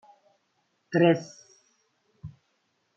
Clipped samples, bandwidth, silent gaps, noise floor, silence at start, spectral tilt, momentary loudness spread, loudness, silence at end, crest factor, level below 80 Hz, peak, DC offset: under 0.1%; 7.4 kHz; none; -74 dBFS; 0.9 s; -7 dB/octave; 25 LU; -24 LUFS; 0.7 s; 22 dB; -70 dBFS; -8 dBFS; under 0.1%